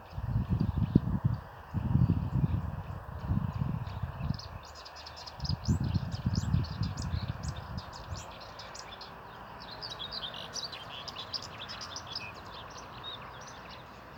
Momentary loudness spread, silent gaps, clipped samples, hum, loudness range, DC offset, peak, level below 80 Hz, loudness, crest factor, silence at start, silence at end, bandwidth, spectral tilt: 16 LU; none; under 0.1%; none; 9 LU; under 0.1%; -6 dBFS; -44 dBFS; -36 LUFS; 28 dB; 0 s; 0 s; 17.5 kHz; -6 dB/octave